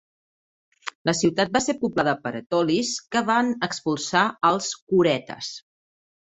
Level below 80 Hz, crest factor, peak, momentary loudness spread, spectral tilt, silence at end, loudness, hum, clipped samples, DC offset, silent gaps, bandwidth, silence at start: -62 dBFS; 20 dB; -4 dBFS; 13 LU; -4 dB/octave; 0.8 s; -23 LUFS; none; under 0.1%; under 0.1%; 0.95-1.05 s, 4.82-4.87 s; 8.4 kHz; 0.85 s